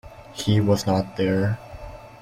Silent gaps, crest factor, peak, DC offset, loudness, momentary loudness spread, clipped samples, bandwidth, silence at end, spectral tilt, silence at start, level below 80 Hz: none; 18 dB; -6 dBFS; under 0.1%; -23 LUFS; 20 LU; under 0.1%; 15.5 kHz; 0.05 s; -6.5 dB/octave; 0.05 s; -46 dBFS